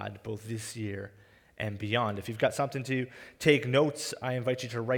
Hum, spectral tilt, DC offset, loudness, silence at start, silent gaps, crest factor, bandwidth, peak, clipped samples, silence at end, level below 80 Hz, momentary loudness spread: none; -5 dB/octave; under 0.1%; -31 LUFS; 0 s; none; 22 dB; 19.5 kHz; -8 dBFS; under 0.1%; 0 s; -66 dBFS; 13 LU